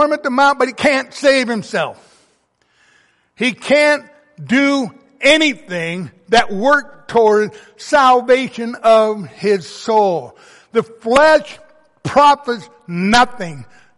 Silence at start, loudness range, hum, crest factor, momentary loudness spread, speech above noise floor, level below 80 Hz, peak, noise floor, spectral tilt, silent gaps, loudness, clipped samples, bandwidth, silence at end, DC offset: 0 s; 4 LU; none; 14 dB; 13 LU; 46 dB; -50 dBFS; 0 dBFS; -60 dBFS; -4 dB/octave; none; -14 LUFS; under 0.1%; 11.5 kHz; 0.35 s; under 0.1%